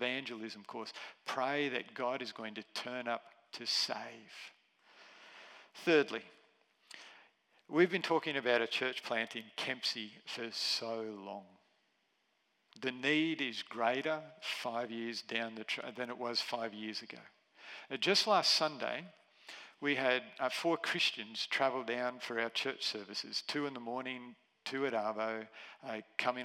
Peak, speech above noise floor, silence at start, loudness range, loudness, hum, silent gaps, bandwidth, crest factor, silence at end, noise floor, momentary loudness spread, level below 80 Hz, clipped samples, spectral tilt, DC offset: -14 dBFS; 41 dB; 0 s; 6 LU; -36 LUFS; none; none; 16 kHz; 24 dB; 0 s; -78 dBFS; 19 LU; under -90 dBFS; under 0.1%; -3 dB/octave; under 0.1%